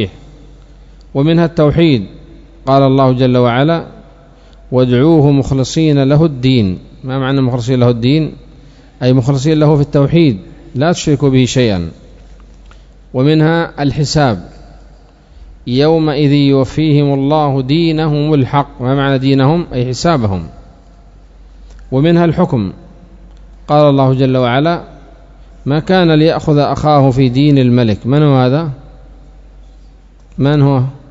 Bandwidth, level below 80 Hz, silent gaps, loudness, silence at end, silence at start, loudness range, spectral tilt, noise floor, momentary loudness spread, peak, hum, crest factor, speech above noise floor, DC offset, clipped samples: 7.8 kHz; -36 dBFS; none; -12 LUFS; 0.15 s; 0 s; 4 LU; -7.5 dB/octave; -40 dBFS; 9 LU; 0 dBFS; none; 12 dB; 30 dB; under 0.1%; 0.3%